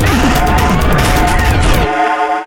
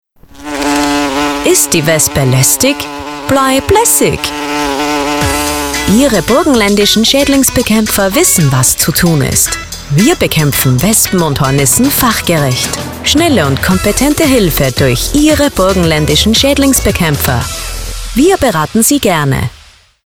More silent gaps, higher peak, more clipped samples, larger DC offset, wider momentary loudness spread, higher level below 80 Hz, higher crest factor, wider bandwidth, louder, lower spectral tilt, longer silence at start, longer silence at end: neither; about the same, 0 dBFS vs 0 dBFS; neither; first, 3% vs 0.5%; second, 2 LU vs 7 LU; first, -16 dBFS vs -26 dBFS; about the same, 10 dB vs 10 dB; second, 17.5 kHz vs over 20 kHz; second, -12 LUFS vs -9 LUFS; about the same, -5 dB/octave vs -4 dB/octave; second, 0 s vs 0.35 s; second, 0 s vs 0.5 s